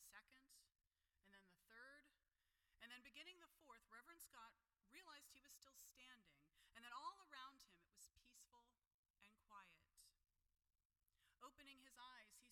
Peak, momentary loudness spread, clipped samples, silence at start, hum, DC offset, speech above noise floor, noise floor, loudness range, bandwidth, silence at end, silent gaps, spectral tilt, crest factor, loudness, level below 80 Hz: -44 dBFS; 10 LU; under 0.1%; 0 s; none; under 0.1%; 25 dB; -90 dBFS; 5 LU; 17 kHz; 0 s; 8.94-9.03 s, 9.10-9.14 s, 10.85-10.90 s; -0.5 dB/octave; 24 dB; -64 LUFS; under -90 dBFS